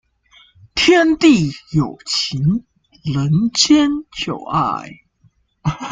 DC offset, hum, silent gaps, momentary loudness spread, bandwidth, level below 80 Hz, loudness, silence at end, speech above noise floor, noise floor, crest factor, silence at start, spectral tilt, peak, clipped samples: under 0.1%; none; none; 12 LU; 9.4 kHz; -46 dBFS; -16 LUFS; 0 s; 41 dB; -57 dBFS; 18 dB; 0.75 s; -4.5 dB/octave; 0 dBFS; under 0.1%